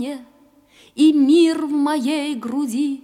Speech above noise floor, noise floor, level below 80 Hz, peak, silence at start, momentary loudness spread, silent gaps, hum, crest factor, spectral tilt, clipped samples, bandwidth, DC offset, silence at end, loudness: 35 dB; -52 dBFS; -70 dBFS; -6 dBFS; 0 s; 15 LU; none; none; 12 dB; -4 dB/octave; under 0.1%; 13 kHz; under 0.1%; 0.05 s; -18 LUFS